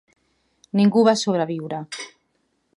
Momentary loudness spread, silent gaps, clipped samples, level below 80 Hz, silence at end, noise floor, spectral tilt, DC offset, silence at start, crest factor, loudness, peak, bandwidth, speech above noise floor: 18 LU; none; under 0.1%; -72 dBFS; 0.7 s; -69 dBFS; -5.5 dB/octave; under 0.1%; 0.75 s; 20 dB; -20 LUFS; -4 dBFS; 11.5 kHz; 50 dB